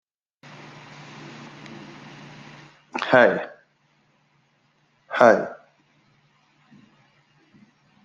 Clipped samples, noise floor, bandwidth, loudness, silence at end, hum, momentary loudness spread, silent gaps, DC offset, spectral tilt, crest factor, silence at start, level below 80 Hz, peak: under 0.1%; -65 dBFS; 7.6 kHz; -20 LUFS; 2.5 s; none; 27 LU; none; under 0.1%; -5.5 dB/octave; 26 dB; 1.2 s; -72 dBFS; 0 dBFS